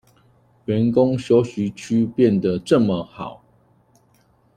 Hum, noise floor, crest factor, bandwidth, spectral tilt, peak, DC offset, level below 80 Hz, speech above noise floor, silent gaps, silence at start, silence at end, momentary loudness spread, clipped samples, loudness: none; -59 dBFS; 18 dB; 11 kHz; -7.5 dB/octave; -2 dBFS; under 0.1%; -56 dBFS; 40 dB; none; 0.7 s; 1.2 s; 16 LU; under 0.1%; -19 LUFS